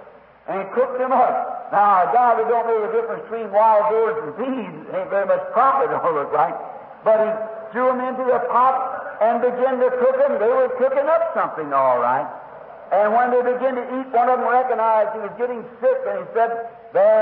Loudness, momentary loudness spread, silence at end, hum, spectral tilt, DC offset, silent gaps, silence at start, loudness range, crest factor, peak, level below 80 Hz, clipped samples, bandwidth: -19 LUFS; 11 LU; 0 s; none; -10 dB/octave; under 0.1%; none; 0 s; 2 LU; 14 dB; -6 dBFS; -70 dBFS; under 0.1%; 4.5 kHz